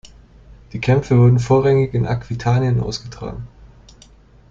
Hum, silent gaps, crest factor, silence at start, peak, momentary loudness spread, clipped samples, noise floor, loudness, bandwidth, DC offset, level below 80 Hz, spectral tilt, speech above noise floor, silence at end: none; none; 16 dB; 0.05 s; -2 dBFS; 18 LU; under 0.1%; -47 dBFS; -17 LUFS; 7.6 kHz; under 0.1%; -40 dBFS; -7.5 dB/octave; 31 dB; 0.85 s